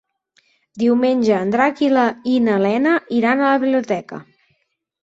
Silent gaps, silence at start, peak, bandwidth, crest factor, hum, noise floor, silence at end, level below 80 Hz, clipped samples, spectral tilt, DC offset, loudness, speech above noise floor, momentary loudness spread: none; 0.75 s; -2 dBFS; 7.8 kHz; 16 dB; none; -68 dBFS; 0.8 s; -62 dBFS; under 0.1%; -6.5 dB/octave; under 0.1%; -17 LUFS; 52 dB; 7 LU